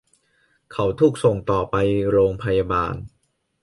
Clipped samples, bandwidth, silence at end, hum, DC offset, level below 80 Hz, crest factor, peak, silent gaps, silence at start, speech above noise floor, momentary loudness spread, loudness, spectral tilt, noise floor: under 0.1%; 11.5 kHz; 0.55 s; none; under 0.1%; -42 dBFS; 16 dB; -4 dBFS; none; 0.7 s; 44 dB; 8 LU; -20 LUFS; -7.5 dB/octave; -64 dBFS